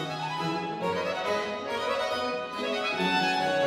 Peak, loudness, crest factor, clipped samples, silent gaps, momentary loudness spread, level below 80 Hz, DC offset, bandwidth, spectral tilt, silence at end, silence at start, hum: -14 dBFS; -29 LUFS; 14 dB; under 0.1%; none; 6 LU; -68 dBFS; under 0.1%; 16 kHz; -4.5 dB/octave; 0 s; 0 s; none